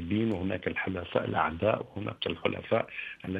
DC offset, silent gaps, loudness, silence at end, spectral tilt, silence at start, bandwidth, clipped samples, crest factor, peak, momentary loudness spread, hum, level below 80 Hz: under 0.1%; none; -31 LUFS; 0 s; -8 dB/octave; 0 s; 7.2 kHz; under 0.1%; 22 dB; -10 dBFS; 6 LU; none; -56 dBFS